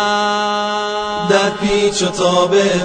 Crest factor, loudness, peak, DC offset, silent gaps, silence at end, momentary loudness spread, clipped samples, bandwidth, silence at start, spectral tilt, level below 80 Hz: 14 dB; -15 LUFS; 0 dBFS; under 0.1%; none; 0 s; 6 LU; under 0.1%; 9.6 kHz; 0 s; -3.5 dB/octave; -44 dBFS